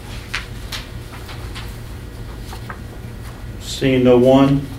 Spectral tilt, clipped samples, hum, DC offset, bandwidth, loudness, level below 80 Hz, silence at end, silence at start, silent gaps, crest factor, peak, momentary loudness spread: -6.5 dB/octave; under 0.1%; none; under 0.1%; 16 kHz; -16 LUFS; -34 dBFS; 0 s; 0 s; none; 18 dB; 0 dBFS; 21 LU